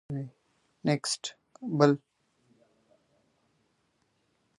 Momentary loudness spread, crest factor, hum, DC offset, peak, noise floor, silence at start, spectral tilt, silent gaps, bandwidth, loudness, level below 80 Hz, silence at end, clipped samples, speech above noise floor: 17 LU; 28 dB; none; under 0.1%; -6 dBFS; -74 dBFS; 0.1 s; -5 dB/octave; none; 11.5 kHz; -29 LUFS; -72 dBFS; 2.6 s; under 0.1%; 46 dB